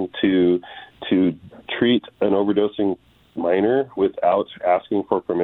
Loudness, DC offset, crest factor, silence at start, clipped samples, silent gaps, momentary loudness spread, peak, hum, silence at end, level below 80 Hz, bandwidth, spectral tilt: -21 LUFS; under 0.1%; 16 dB; 0 s; under 0.1%; none; 12 LU; -4 dBFS; none; 0 s; -58 dBFS; 4.1 kHz; -9.5 dB/octave